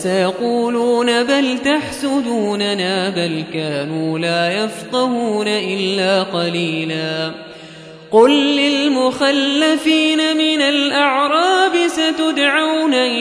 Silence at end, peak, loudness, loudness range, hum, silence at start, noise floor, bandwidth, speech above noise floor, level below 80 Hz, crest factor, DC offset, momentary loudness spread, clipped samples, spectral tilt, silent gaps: 0 s; 0 dBFS; -16 LUFS; 5 LU; none; 0 s; -36 dBFS; 11 kHz; 21 dB; -58 dBFS; 16 dB; under 0.1%; 7 LU; under 0.1%; -4 dB/octave; none